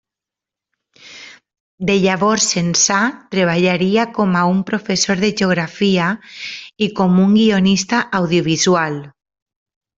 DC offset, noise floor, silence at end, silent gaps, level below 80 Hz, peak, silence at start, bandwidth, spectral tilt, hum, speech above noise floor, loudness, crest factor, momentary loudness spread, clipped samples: under 0.1%; -86 dBFS; 0.9 s; 1.60-1.78 s; -54 dBFS; -2 dBFS; 1.05 s; 7.8 kHz; -4 dB/octave; none; 71 dB; -15 LUFS; 14 dB; 12 LU; under 0.1%